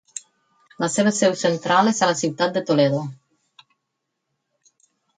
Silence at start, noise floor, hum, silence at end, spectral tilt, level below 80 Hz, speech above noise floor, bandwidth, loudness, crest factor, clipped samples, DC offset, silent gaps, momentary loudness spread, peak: 0.15 s; -78 dBFS; none; 2.05 s; -4.5 dB/octave; -70 dBFS; 59 dB; 9.6 kHz; -20 LUFS; 20 dB; under 0.1%; under 0.1%; none; 12 LU; -4 dBFS